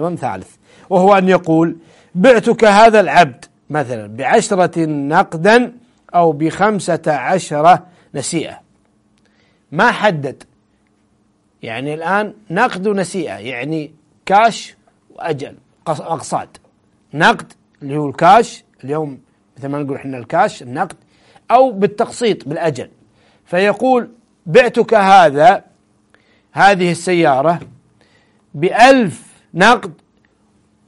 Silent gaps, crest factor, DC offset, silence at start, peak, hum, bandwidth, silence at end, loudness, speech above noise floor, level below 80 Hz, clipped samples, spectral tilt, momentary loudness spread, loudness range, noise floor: none; 14 dB; under 0.1%; 0 s; 0 dBFS; none; 11.5 kHz; 0.95 s; -14 LUFS; 45 dB; -54 dBFS; under 0.1%; -5 dB/octave; 17 LU; 8 LU; -58 dBFS